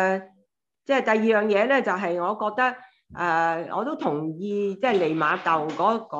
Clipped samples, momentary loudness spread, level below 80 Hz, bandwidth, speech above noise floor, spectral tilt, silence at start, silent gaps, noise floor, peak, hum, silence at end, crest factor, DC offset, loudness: under 0.1%; 8 LU; -70 dBFS; 8 kHz; 45 dB; -6 dB/octave; 0 s; none; -68 dBFS; -6 dBFS; none; 0 s; 18 dB; under 0.1%; -24 LUFS